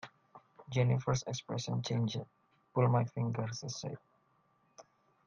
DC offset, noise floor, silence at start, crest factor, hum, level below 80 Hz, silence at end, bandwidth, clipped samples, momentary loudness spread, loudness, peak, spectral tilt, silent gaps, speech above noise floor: under 0.1%; -73 dBFS; 0.05 s; 20 dB; none; -66 dBFS; 0.45 s; 7.2 kHz; under 0.1%; 14 LU; -35 LUFS; -16 dBFS; -6 dB/octave; none; 39 dB